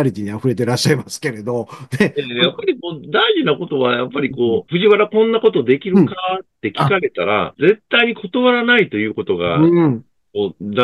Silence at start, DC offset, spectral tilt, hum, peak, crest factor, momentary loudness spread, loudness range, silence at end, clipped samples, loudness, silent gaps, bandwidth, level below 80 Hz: 0 s; under 0.1%; -5.5 dB/octave; none; 0 dBFS; 16 dB; 10 LU; 3 LU; 0 s; under 0.1%; -16 LUFS; none; 12.5 kHz; -56 dBFS